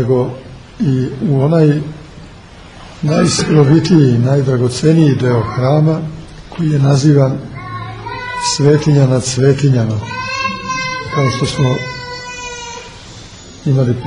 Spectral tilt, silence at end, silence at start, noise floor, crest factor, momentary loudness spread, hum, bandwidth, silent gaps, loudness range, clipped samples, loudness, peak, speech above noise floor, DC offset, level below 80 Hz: -6.5 dB/octave; 0 s; 0 s; -36 dBFS; 14 dB; 16 LU; none; 10.5 kHz; none; 6 LU; under 0.1%; -13 LUFS; 0 dBFS; 24 dB; under 0.1%; -40 dBFS